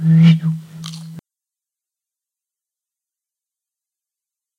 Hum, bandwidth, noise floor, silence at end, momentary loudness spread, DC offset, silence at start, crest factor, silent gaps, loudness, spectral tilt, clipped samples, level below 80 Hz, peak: none; 6.8 kHz; -87 dBFS; 3.4 s; 23 LU; under 0.1%; 0 s; 18 dB; none; -13 LUFS; -8 dB/octave; under 0.1%; -60 dBFS; -2 dBFS